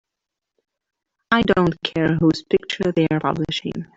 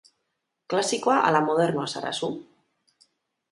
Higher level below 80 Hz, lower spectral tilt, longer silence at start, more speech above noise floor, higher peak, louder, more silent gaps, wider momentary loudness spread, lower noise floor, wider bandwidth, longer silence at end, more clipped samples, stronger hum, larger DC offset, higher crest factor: first, -48 dBFS vs -74 dBFS; first, -6.5 dB/octave vs -4 dB/octave; first, 1.3 s vs 0.7 s; first, 64 dB vs 55 dB; about the same, -4 dBFS vs -6 dBFS; first, -20 LUFS vs -24 LUFS; neither; second, 5 LU vs 10 LU; first, -84 dBFS vs -79 dBFS; second, 7.8 kHz vs 11.5 kHz; second, 0.1 s vs 1.1 s; neither; neither; neither; about the same, 18 dB vs 20 dB